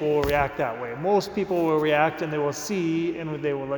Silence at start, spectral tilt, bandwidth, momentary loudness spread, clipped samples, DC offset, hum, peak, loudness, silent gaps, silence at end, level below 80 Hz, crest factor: 0 s; -5.5 dB/octave; 19 kHz; 7 LU; under 0.1%; under 0.1%; none; -6 dBFS; -25 LUFS; none; 0 s; -48 dBFS; 18 dB